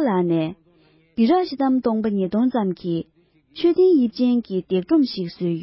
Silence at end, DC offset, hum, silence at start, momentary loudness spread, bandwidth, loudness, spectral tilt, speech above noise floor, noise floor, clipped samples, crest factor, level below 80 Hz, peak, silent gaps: 0 s; under 0.1%; none; 0 s; 10 LU; 5.8 kHz; -21 LUFS; -11.5 dB/octave; 37 dB; -57 dBFS; under 0.1%; 14 dB; -60 dBFS; -8 dBFS; none